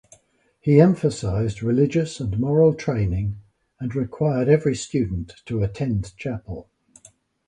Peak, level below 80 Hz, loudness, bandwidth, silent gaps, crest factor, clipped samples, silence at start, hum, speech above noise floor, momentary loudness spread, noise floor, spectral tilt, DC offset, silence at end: -2 dBFS; -42 dBFS; -22 LUFS; 10.5 kHz; none; 20 dB; under 0.1%; 0.65 s; none; 41 dB; 13 LU; -62 dBFS; -7.5 dB/octave; under 0.1%; 0.85 s